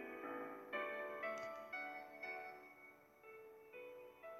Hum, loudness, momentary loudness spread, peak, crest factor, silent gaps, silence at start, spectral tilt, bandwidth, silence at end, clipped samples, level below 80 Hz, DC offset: none; -49 LUFS; 14 LU; -32 dBFS; 18 dB; none; 0 s; -4 dB/octave; 19.5 kHz; 0 s; under 0.1%; -90 dBFS; under 0.1%